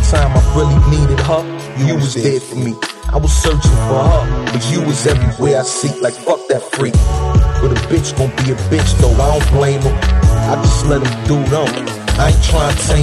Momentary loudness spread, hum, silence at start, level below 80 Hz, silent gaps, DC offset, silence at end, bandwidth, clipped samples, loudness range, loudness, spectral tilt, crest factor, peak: 6 LU; none; 0 s; -16 dBFS; none; under 0.1%; 0 s; 12.5 kHz; under 0.1%; 2 LU; -14 LUFS; -5.5 dB/octave; 12 dB; -2 dBFS